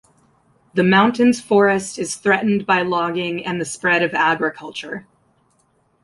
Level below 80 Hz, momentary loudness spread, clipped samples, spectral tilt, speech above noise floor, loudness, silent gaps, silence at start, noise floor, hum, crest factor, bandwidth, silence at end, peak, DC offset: -60 dBFS; 13 LU; under 0.1%; -5 dB/octave; 44 dB; -18 LUFS; none; 0.75 s; -62 dBFS; none; 16 dB; 11.5 kHz; 1.05 s; -2 dBFS; under 0.1%